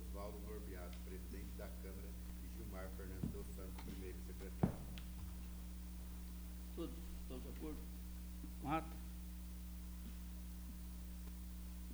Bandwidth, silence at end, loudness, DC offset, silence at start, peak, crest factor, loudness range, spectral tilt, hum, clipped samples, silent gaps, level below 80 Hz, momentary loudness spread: over 20 kHz; 0 s; -50 LUFS; under 0.1%; 0 s; -22 dBFS; 26 dB; 3 LU; -6 dB/octave; 60 Hz at -50 dBFS; under 0.1%; none; -50 dBFS; 9 LU